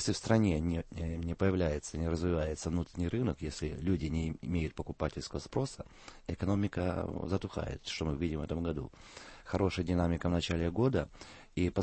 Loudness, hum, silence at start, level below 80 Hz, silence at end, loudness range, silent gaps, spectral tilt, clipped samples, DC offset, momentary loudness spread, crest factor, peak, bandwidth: -35 LUFS; none; 0 s; -46 dBFS; 0 s; 3 LU; none; -6.5 dB/octave; under 0.1%; under 0.1%; 11 LU; 20 dB; -14 dBFS; 8.8 kHz